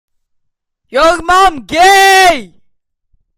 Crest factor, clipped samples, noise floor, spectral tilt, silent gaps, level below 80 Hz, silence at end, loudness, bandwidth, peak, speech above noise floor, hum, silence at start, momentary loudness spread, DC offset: 12 dB; under 0.1%; -66 dBFS; -1.5 dB/octave; none; -36 dBFS; 0.9 s; -8 LUFS; 17 kHz; 0 dBFS; 58 dB; none; 0.9 s; 9 LU; under 0.1%